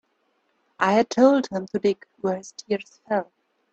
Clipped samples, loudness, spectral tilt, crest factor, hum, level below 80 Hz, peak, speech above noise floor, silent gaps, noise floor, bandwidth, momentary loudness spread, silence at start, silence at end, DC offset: under 0.1%; -23 LUFS; -5.5 dB/octave; 20 dB; none; -68 dBFS; -4 dBFS; 47 dB; none; -70 dBFS; 8.2 kHz; 11 LU; 0.8 s; 0.5 s; under 0.1%